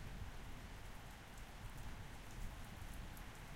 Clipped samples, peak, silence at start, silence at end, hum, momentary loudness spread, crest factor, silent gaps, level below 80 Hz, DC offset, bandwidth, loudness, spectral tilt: under 0.1%; -34 dBFS; 0 s; 0 s; none; 3 LU; 16 dB; none; -54 dBFS; under 0.1%; 16 kHz; -54 LUFS; -4.5 dB/octave